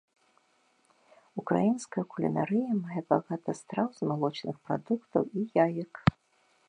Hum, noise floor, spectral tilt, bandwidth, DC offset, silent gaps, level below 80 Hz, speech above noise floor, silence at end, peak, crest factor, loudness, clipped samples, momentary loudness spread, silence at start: none; -69 dBFS; -7.5 dB/octave; 10.5 kHz; under 0.1%; none; -58 dBFS; 40 dB; 0.55 s; -6 dBFS; 26 dB; -31 LUFS; under 0.1%; 8 LU; 1.35 s